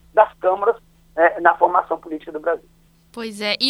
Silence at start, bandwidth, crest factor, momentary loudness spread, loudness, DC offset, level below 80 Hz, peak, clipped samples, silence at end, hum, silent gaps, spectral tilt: 0.15 s; 13 kHz; 20 dB; 16 LU; -19 LUFS; under 0.1%; -56 dBFS; 0 dBFS; under 0.1%; 0 s; none; none; -3 dB/octave